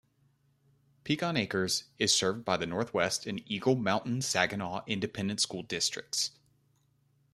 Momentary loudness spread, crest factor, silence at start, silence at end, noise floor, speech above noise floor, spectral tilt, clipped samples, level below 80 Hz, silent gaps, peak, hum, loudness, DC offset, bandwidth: 7 LU; 24 dB; 1.05 s; 1.05 s; -71 dBFS; 39 dB; -3 dB/octave; under 0.1%; -68 dBFS; none; -8 dBFS; none; -31 LUFS; under 0.1%; 14 kHz